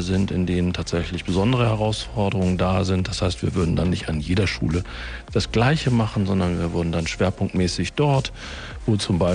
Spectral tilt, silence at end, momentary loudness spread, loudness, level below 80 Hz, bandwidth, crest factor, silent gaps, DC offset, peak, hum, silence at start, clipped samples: -6 dB/octave; 0 s; 6 LU; -22 LUFS; -38 dBFS; 10 kHz; 14 dB; none; under 0.1%; -6 dBFS; none; 0 s; under 0.1%